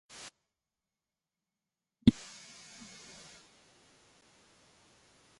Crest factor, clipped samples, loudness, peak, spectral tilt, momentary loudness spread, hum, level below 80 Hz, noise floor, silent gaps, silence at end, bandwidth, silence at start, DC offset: 32 dB; under 0.1%; -30 LUFS; -8 dBFS; -6 dB/octave; 24 LU; none; -56 dBFS; under -90 dBFS; none; 3.3 s; 11.5 kHz; 2.05 s; under 0.1%